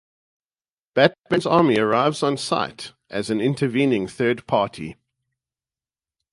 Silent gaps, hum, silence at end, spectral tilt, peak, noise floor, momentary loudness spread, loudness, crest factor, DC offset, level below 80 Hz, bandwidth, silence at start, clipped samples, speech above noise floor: none; none; 1.4 s; -5.5 dB/octave; 0 dBFS; under -90 dBFS; 12 LU; -21 LUFS; 22 dB; under 0.1%; -60 dBFS; 11.5 kHz; 0.95 s; under 0.1%; over 69 dB